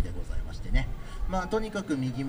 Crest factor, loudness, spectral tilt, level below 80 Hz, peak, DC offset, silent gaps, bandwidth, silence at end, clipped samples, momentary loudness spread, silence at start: 18 dB; -33 LUFS; -6.5 dB/octave; -32 dBFS; -12 dBFS; under 0.1%; none; 15.5 kHz; 0 s; under 0.1%; 9 LU; 0 s